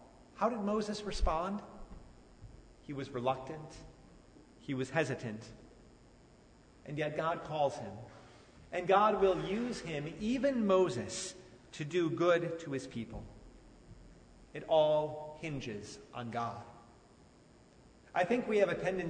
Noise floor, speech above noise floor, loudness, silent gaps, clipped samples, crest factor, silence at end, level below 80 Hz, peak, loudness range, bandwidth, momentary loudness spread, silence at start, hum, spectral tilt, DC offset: -61 dBFS; 27 dB; -34 LUFS; none; under 0.1%; 20 dB; 0 s; -52 dBFS; -16 dBFS; 9 LU; 9.6 kHz; 21 LU; 0 s; none; -5.5 dB/octave; under 0.1%